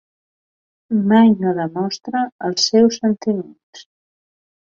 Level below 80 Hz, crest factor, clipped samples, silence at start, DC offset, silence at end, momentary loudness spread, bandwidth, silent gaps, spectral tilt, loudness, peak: -62 dBFS; 16 dB; under 0.1%; 0.9 s; under 0.1%; 0.95 s; 11 LU; 7.4 kHz; 2.32-2.39 s, 3.63-3.73 s; -5 dB/octave; -17 LUFS; -2 dBFS